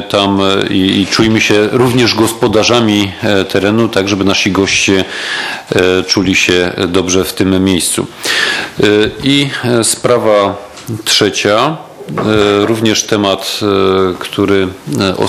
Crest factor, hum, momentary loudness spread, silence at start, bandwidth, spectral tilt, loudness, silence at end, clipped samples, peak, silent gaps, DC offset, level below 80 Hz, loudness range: 12 dB; none; 6 LU; 0 s; 16 kHz; -4 dB/octave; -11 LUFS; 0 s; under 0.1%; 0 dBFS; none; under 0.1%; -44 dBFS; 2 LU